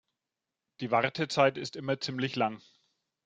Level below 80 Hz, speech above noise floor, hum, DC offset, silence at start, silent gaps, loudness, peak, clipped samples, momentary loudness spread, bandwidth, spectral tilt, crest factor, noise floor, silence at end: -74 dBFS; 59 dB; none; under 0.1%; 0.8 s; none; -30 LUFS; -10 dBFS; under 0.1%; 11 LU; 9.4 kHz; -5 dB/octave; 22 dB; -89 dBFS; 0.7 s